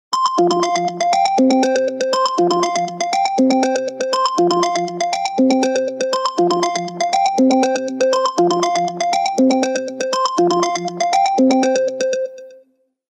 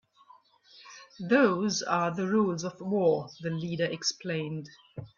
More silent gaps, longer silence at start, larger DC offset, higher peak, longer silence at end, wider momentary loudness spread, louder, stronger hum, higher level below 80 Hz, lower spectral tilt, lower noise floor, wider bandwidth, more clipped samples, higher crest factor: neither; second, 0.1 s vs 0.75 s; neither; first, -4 dBFS vs -10 dBFS; first, 0.55 s vs 0.1 s; second, 6 LU vs 21 LU; first, -17 LUFS vs -29 LUFS; neither; about the same, -74 dBFS vs -70 dBFS; about the same, -4 dB/octave vs -5 dB/octave; second, -55 dBFS vs -59 dBFS; first, 11 kHz vs 7.4 kHz; neither; second, 12 dB vs 20 dB